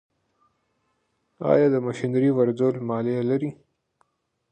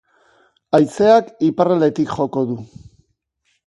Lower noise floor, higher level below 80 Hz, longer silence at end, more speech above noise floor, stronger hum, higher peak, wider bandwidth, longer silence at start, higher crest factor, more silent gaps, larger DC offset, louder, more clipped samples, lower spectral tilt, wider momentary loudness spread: first, -72 dBFS vs -68 dBFS; second, -68 dBFS vs -56 dBFS; about the same, 1 s vs 1 s; about the same, 50 dB vs 52 dB; neither; second, -6 dBFS vs 0 dBFS; second, 9 kHz vs 11.5 kHz; first, 1.4 s vs 0.75 s; about the same, 20 dB vs 18 dB; neither; neither; second, -23 LUFS vs -17 LUFS; neither; first, -8.5 dB/octave vs -7 dB/octave; about the same, 8 LU vs 9 LU